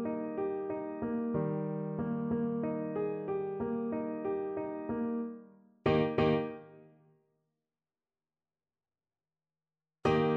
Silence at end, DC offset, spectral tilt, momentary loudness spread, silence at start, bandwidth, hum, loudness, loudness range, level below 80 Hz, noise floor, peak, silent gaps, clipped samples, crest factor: 0 s; under 0.1%; -8.5 dB/octave; 8 LU; 0 s; 7 kHz; none; -34 LUFS; 4 LU; -60 dBFS; under -90 dBFS; -14 dBFS; none; under 0.1%; 20 dB